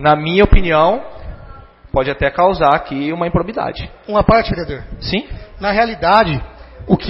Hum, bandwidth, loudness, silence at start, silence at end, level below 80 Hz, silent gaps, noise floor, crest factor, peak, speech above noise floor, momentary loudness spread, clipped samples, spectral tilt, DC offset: none; 5.8 kHz; -15 LUFS; 0 s; 0 s; -24 dBFS; none; -38 dBFS; 16 dB; 0 dBFS; 23 dB; 16 LU; under 0.1%; -9 dB/octave; under 0.1%